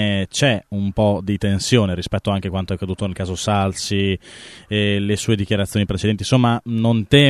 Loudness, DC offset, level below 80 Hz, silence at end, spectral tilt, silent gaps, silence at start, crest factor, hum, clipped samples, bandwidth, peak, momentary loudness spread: -20 LUFS; under 0.1%; -42 dBFS; 0 s; -5.5 dB/octave; none; 0 s; 18 dB; none; under 0.1%; 13.5 kHz; 0 dBFS; 7 LU